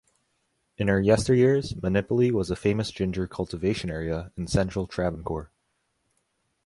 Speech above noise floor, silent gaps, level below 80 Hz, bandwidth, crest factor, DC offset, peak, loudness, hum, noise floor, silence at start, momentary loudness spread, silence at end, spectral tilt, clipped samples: 50 dB; none; -44 dBFS; 11.5 kHz; 18 dB; under 0.1%; -8 dBFS; -26 LUFS; none; -74 dBFS; 0.8 s; 11 LU; 1.2 s; -6.5 dB/octave; under 0.1%